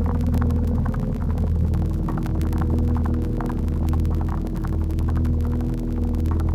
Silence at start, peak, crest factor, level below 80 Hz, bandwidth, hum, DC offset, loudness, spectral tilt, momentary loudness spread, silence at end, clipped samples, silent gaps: 0 s; -8 dBFS; 12 dB; -26 dBFS; 12.5 kHz; none; under 0.1%; -24 LUFS; -9.5 dB/octave; 4 LU; 0 s; under 0.1%; none